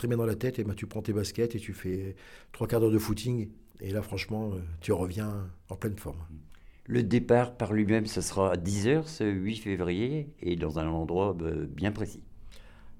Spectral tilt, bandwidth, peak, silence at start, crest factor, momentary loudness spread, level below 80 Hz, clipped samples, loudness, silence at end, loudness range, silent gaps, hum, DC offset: -6.5 dB/octave; 17.5 kHz; -12 dBFS; 0 s; 18 dB; 13 LU; -50 dBFS; under 0.1%; -31 LUFS; 0.05 s; 6 LU; none; none; under 0.1%